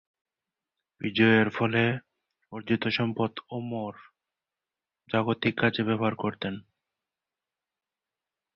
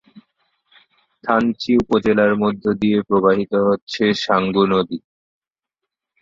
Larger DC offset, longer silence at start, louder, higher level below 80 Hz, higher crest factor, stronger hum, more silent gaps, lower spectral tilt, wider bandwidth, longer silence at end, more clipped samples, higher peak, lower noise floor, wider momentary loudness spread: neither; second, 1 s vs 1.25 s; second, -27 LUFS vs -18 LUFS; second, -66 dBFS vs -52 dBFS; about the same, 22 dB vs 18 dB; neither; second, none vs 3.82-3.87 s; first, -8 dB/octave vs -6.5 dB/octave; second, 6 kHz vs 7.6 kHz; first, 1.95 s vs 1.25 s; neither; second, -8 dBFS vs -2 dBFS; first, under -90 dBFS vs -83 dBFS; first, 15 LU vs 4 LU